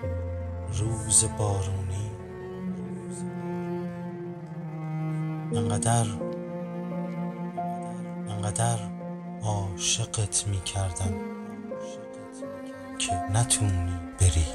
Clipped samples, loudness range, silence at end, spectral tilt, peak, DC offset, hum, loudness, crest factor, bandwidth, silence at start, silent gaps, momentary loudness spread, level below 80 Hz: under 0.1%; 5 LU; 0 s; -4.5 dB/octave; -8 dBFS; under 0.1%; none; -29 LUFS; 22 dB; 13.5 kHz; 0 s; none; 14 LU; -44 dBFS